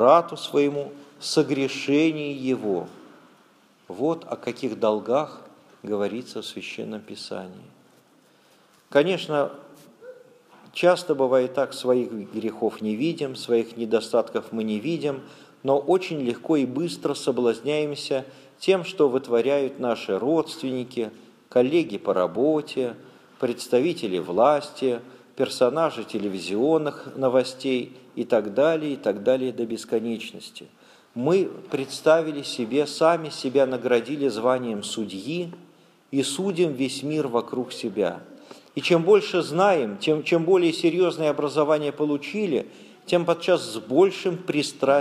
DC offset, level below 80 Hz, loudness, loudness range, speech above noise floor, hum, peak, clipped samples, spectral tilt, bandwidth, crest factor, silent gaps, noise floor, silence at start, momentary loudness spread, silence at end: under 0.1%; -76 dBFS; -24 LUFS; 6 LU; 35 dB; none; -4 dBFS; under 0.1%; -5.5 dB/octave; 14.5 kHz; 20 dB; none; -58 dBFS; 0 s; 12 LU; 0 s